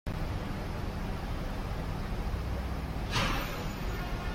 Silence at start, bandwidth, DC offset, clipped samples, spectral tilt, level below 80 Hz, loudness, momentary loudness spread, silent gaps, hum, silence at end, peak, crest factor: 0.05 s; 16.5 kHz; under 0.1%; under 0.1%; -5.5 dB/octave; -38 dBFS; -36 LUFS; 6 LU; none; none; 0 s; -18 dBFS; 16 dB